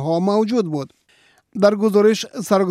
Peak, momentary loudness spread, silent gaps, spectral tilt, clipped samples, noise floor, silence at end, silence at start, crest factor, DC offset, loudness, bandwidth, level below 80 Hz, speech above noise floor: -2 dBFS; 13 LU; none; -6 dB/octave; under 0.1%; -56 dBFS; 0 s; 0 s; 16 dB; under 0.1%; -18 LUFS; 15 kHz; -68 dBFS; 39 dB